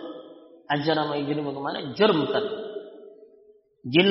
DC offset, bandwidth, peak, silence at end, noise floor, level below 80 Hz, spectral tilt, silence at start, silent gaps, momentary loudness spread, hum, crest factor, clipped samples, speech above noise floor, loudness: under 0.1%; 5.8 kHz; -4 dBFS; 0 s; -57 dBFS; -68 dBFS; -3.5 dB/octave; 0 s; none; 19 LU; none; 22 dB; under 0.1%; 33 dB; -25 LUFS